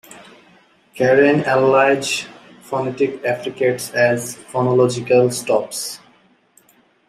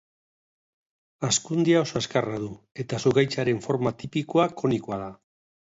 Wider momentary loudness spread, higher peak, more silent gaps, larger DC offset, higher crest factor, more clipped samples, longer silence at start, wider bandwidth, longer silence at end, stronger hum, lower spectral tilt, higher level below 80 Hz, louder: about the same, 12 LU vs 12 LU; first, -2 dBFS vs -8 dBFS; second, none vs 2.71-2.75 s; neither; about the same, 16 dB vs 20 dB; neither; second, 0.1 s vs 1.2 s; first, 15.5 kHz vs 8 kHz; first, 1.1 s vs 0.6 s; neither; about the same, -4.5 dB/octave vs -5 dB/octave; about the same, -64 dBFS vs -60 dBFS; first, -17 LUFS vs -25 LUFS